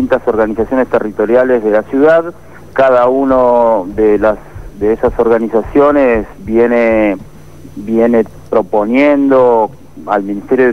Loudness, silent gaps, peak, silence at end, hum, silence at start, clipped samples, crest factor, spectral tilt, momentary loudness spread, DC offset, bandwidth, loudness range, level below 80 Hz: -11 LUFS; none; 0 dBFS; 0 s; none; 0 s; under 0.1%; 10 dB; -8 dB/octave; 8 LU; 1%; 12 kHz; 2 LU; -36 dBFS